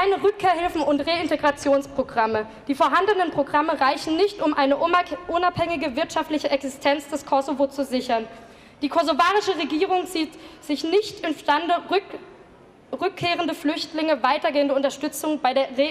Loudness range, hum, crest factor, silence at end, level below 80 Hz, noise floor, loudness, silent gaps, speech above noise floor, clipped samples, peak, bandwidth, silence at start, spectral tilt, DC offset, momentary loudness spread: 4 LU; none; 16 dB; 0 s; -56 dBFS; -50 dBFS; -23 LUFS; none; 27 dB; under 0.1%; -6 dBFS; 15.5 kHz; 0 s; -4 dB/octave; under 0.1%; 8 LU